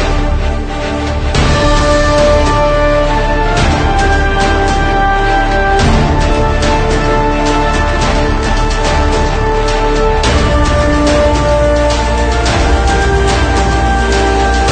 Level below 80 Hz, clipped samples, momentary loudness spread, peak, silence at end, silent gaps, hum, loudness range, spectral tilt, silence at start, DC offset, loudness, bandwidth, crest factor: -14 dBFS; under 0.1%; 3 LU; 0 dBFS; 0 s; none; none; 1 LU; -5 dB/octave; 0 s; under 0.1%; -12 LUFS; 9.4 kHz; 10 dB